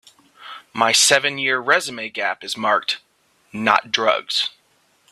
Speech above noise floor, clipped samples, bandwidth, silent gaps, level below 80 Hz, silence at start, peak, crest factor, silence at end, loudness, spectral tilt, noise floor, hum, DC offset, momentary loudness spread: 41 dB; under 0.1%; 15.5 kHz; none; -70 dBFS; 0.4 s; 0 dBFS; 22 dB; 0.65 s; -18 LUFS; -1 dB/octave; -61 dBFS; none; under 0.1%; 15 LU